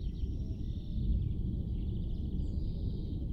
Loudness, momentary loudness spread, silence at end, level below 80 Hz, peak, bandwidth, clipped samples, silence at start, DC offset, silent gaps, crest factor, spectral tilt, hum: -38 LUFS; 5 LU; 0 s; -36 dBFS; -22 dBFS; 5.8 kHz; under 0.1%; 0 s; under 0.1%; none; 12 dB; -10.5 dB/octave; none